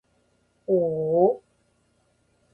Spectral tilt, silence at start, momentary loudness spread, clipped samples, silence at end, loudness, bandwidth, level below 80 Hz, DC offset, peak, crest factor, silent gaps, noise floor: -12 dB/octave; 0.7 s; 14 LU; under 0.1%; 1.15 s; -24 LUFS; 1.5 kHz; -66 dBFS; under 0.1%; -8 dBFS; 20 dB; none; -67 dBFS